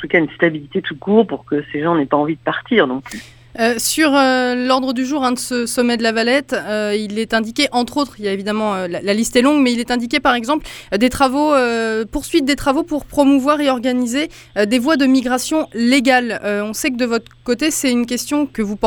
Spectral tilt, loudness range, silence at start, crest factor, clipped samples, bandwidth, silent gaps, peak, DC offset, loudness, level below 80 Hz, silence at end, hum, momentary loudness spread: -3.5 dB/octave; 2 LU; 0 s; 16 dB; under 0.1%; over 20 kHz; none; 0 dBFS; under 0.1%; -17 LUFS; -44 dBFS; 0 s; none; 8 LU